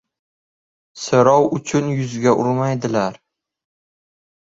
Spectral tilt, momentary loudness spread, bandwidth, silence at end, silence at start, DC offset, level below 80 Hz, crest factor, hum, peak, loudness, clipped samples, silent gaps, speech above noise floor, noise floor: -6 dB/octave; 9 LU; 7.8 kHz; 1.45 s; 0.95 s; under 0.1%; -58 dBFS; 18 dB; none; -2 dBFS; -18 LUFS; under 0.1%; none; over 73 dB; under -90 dBFS